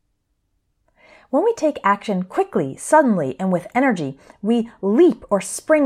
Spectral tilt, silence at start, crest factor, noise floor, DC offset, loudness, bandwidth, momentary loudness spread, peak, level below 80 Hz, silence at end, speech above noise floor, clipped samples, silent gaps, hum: -6 dB/octave; 1.35 s; 18 dB; -70 dBFS; under 0.1%; -19 LUFS; 15 kHz; 8 LU; -2 dBFS; -60 dBFS; 0 s; 51 dB; under 0.1%; none; none